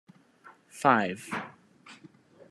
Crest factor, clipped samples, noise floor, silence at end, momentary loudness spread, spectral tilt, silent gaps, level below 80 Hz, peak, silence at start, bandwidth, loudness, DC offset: 26 dB; under 0.1%; -57 dBFS; 0.55 s; 26 LU; -5 dB/octave; none; -78 dBFS; -6 dBFS; 0.75 s; 13.5 kHz; -28 LUFS; under 0.1%